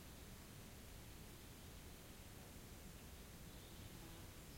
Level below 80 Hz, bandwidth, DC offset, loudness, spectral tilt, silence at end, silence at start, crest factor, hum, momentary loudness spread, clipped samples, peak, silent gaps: -62 dBFS; 16.5 kHz; under 0.1%; -58 LUFS; -4 dB/octave; 0 s; 0 s; 14 dB; none; 1 LU; under 0.1%; -44 dBFS; none